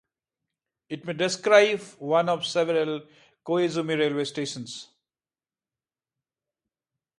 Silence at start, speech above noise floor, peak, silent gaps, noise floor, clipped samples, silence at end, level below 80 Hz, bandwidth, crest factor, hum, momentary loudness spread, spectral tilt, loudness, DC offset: 0.9 s; over 65 dB; -4 dBFS; none; under -90 dBFS; under 0.1%; 2.35 s; -76 dBFS; 11.5 kHz; 24 dB; none; 18 LU; -4 dB/octave; -24 LUFS; under 0.1%